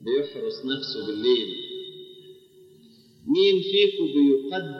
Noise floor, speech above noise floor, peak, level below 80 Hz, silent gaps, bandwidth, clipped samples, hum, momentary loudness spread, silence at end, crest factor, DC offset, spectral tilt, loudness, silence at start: -54 dBFS; 31 dB; -8 dBFS; -76 dBFS; none; 6.4 kHz; under 0.1%; none; 17 LU; 0 s; 16 dB; under 0.1%; -6 dB/octave; -23 LUFS; 0 s